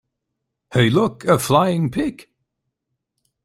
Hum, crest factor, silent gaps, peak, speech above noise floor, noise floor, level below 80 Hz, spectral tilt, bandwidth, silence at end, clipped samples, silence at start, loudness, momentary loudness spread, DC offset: none; 18 dB; none; -2 dBFS; 61 dB; -79 dBFS; -52 dBFS; -6 dB/octave; 16 kHz; 1.2 s; under 0.1%; 0.7 s; -18 LUFS; 8 LU; under 0.1%